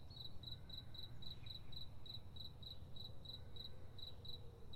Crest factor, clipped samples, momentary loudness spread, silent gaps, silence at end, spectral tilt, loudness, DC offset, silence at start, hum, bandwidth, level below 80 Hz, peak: 14 dB; under 0.1%; 3 LU; none; 0 s; -5.5 dB/octave; -54 LUFS; under 0.1%; 0 s; none; 16 kHz; -62 dBFS; -36 dBFS